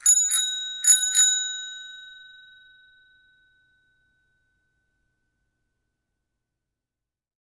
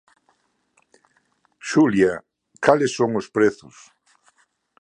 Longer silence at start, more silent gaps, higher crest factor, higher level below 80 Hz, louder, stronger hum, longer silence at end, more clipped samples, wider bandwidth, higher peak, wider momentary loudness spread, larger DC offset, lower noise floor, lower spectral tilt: second, 0.05 s vs 1.65 s; neither; about the same, 24 dB vs 22 dB; second, -72 dBFS vs -60 dBFS; about the same, -19 LUFS vs -20 LUFS; neither; first, 5.3 s vs 1.25 s; neither; first, 11.5 kHz vs 10 kHz; second, -4 dBFS vs 0 dBFS; first, 22 LU vs 16 LU; neither; first, -88 dBFS vs -66 dBFS; second, 7 dB/octave vs -5.5 dB/octave